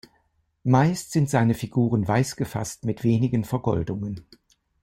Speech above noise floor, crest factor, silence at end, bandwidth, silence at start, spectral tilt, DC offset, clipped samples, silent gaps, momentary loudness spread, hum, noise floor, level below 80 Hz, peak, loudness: 45 dB; 18 dB; 0.6 s; 16.5 kHz; 0.65 s; -7 dB/octave; under 0.1%; under 0.1%; none; 10 LU; none; -68 dBFS; -52 dBFS; -6 dBFS; -24 LUFS